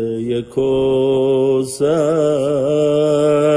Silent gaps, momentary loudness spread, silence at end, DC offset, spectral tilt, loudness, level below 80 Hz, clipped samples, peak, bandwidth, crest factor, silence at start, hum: none; 5 LU; 0 s; under 0.1%; -6.5 dB/octave; -16 LUFS; -50 dBFS; under 0.1%; -4 dBFS; 11 kHz; 12 dB; 0 s; none